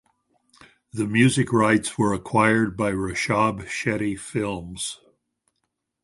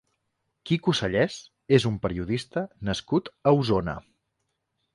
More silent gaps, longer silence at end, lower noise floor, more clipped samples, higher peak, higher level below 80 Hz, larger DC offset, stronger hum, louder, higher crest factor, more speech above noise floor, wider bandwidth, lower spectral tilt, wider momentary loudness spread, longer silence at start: neither; first, 1.1 s vs 0.95 s; about the same, -78 dBFS vs -78 dBFS; neither; first, -2 dBFS vs -6 dBFS; about the same, -52 dBFS vs -50 dBFS; neither; neither; first, -23 LUFS vs -26 LUFS; about the same, 22 dB vs 20 dB; about the same, 55 dB vs 53 dB; about the same, 11.5 kHz vs 11.5 kHz; about the same, -5 dB/octave vs -6 dB/octave; about the same, 11 LU vs 11 LU; first, 0.95 s vs 0.65 s